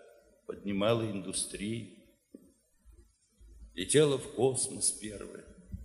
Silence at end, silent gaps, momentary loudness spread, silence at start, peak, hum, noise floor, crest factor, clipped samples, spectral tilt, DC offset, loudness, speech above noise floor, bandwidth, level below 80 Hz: 0 s; none; 21 LU; 0.5 s; -12 dBFS; none; -65 dBFS; 22 dB; under 0.1%; -4 dB/octave; under 0.1%; -31 LUFS; 33 dB; 13.5 kHz; -58 dBFS